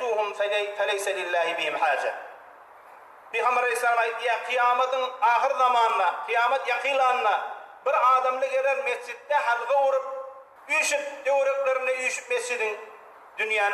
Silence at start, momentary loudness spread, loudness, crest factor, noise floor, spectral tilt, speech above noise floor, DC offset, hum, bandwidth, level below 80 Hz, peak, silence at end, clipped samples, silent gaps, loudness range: 0 s; 10 LU; -24 LUFS; 14 dB; -49 dBFS; 0.5 dB/octave; 24 dB; under 0.1%; none; 14.5 kHz; -84 dBFS; -10 dBFS; 0 s; under 0.1%; none; 4 LU